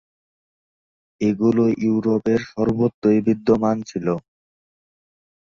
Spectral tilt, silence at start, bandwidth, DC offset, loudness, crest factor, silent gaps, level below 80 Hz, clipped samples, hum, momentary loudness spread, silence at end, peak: -8 dB/octave; 1.2 s; 7.2 kHz; under 0.1%; -20 LUFS; 16 dB; 2.94-3.02 s; -54 dBFS; under 0.1%; none; 7 LU; 1.2 s; -6 dBFS